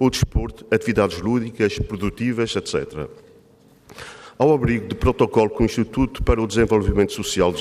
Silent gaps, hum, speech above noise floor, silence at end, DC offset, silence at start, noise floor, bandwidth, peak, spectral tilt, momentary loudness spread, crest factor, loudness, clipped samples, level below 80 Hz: none; none; 32 dB; 0 s; under 0.1%; 0 s; -52 dBFS; 15 kHz; -4 dBFS; -6 dB/octave; 11 LU; 16 dB; -21 LUFS; under 0.1%; -32 dBFS